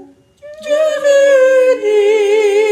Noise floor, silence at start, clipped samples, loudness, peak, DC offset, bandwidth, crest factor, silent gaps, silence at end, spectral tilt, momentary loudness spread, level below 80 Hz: -38 dBFS; 0 s; under 0.1%; -11 LUFS; -2 dBFS; under 0.1%; 12 kHz; 10 dB; none; 0 s; -1.5 dB/octave; 6 LU; -66 dBFS